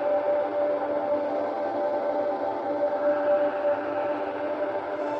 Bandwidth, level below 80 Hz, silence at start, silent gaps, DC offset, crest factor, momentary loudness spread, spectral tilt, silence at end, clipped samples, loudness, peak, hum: 5.8 kHz; -70 dBFS; 0 s; none; under 0.1%; 12 dB; 5 LU; -7 dB/octave; 0 s; under 0.1%; -27 LUFS; -14 dBFS; none